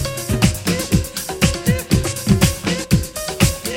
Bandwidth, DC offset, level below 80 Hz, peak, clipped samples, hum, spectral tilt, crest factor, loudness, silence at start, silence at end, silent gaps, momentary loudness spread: 17 kHz; under 0.1%; -30 dBFS; 0 dBFS; under 0.1%; none; -4.5 dB/octave; 18 dB; -18 LUFS; 0 s; 0 s; none; 6 LU